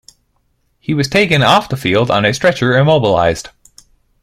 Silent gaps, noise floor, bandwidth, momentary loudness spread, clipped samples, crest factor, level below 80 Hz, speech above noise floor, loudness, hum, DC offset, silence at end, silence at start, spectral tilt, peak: none; -61 dBFS; 15.5 kHz; 8 LU; under 0.1%; 14 dB; -44 dBFS; 49 dB; -13 LUFS; none; under 0.1%; 0.75 s; 0.9 s; -5.5 dB/octave; 0 dBFS